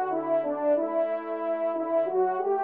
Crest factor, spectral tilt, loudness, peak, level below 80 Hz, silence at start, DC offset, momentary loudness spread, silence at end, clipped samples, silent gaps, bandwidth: 12 dB; -5 dB/octave; -27 LUFS; -14 dBFS; -82 dBFS; 0 s; under 0.1%; 4 LU; 0 s; under 0.1%; none; 3.9 kHz